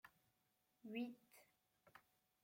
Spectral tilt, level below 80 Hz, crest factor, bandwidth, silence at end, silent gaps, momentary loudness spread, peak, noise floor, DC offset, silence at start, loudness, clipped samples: -5 dB/octave; under -90 dBFS; 22 dB; 16.5 kHz; 0.45 s; none; 19 LU; -36 dBFS; -85 dBFS; under 0.1%; 0.05 s; -51 LUFS; under 0.1%